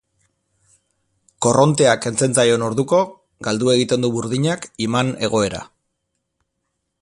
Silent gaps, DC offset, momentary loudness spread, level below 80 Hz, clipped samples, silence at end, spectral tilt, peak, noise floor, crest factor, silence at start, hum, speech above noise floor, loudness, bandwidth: none; under 0.1%; 9 LU; -54 dBFS; under 0.1%; 1.4 s; -4.5 dB/octave; 0 dBFS; -75 dBFS; 20 dB; 1.4 s; none; 57 dB; -18 LUFS; 11.5 kHz